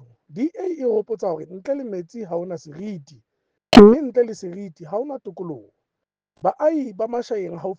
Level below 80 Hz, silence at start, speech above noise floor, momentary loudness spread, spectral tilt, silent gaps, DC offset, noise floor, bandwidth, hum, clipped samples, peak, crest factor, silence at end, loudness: -44 dBFS; 0.35 s; 64 dB; 22 LU; -6.5 dB/octave; none; under 0.1%; -84 dBFS; 9 kHz; none; 0.2%; 0 dBFS; 20 dB; 0.05 s; -19 LUFS